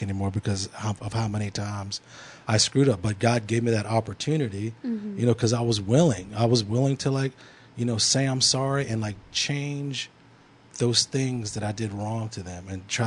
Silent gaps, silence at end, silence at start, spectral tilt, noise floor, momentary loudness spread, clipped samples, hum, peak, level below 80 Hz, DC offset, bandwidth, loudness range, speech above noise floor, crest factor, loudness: none; 0 s; 0 s; -4.5 dB/octave; -54 dBFS; 12 LU; under 0.1%; none; -6 dBFS; -58 dBFS; under 0.1%; 11 kHz; 4 LU; 28 dB; 20 dB; -25 LUFS